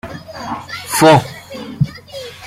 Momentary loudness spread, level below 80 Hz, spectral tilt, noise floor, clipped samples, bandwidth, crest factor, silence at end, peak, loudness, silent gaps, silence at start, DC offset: 21 LU; -44 dBFS; -5 dB/octave; -32 dBFS; under 0.1%; 16 kHz; 16 dB; 0 s; 0 dBFS; -14 LUFS; none; 0.05 s; under 0.1%